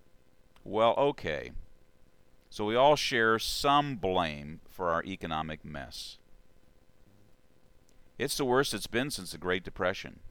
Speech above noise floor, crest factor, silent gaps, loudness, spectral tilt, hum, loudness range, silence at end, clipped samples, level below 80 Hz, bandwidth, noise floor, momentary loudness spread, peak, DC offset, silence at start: 33 dB; 22 dB; none; -30 LUFS; -4 dB/octave; none; 10 LU; 0 s; under 0.1%; -52 dBFS; 19.5 kHz; -63 dBFS; 16 LU; -10 dBFS; under 0.1%; 0.65 s